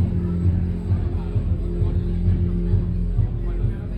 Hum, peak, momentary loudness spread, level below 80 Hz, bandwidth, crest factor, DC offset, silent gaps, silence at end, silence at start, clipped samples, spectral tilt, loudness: none; -8 dBFS; 3 LU; -26 dBFS; 4.3 kHz; 12 dB; under 0.1%; none; 0 s; 0 s; under 0.1%; -11 dB/octave; -23 LUFS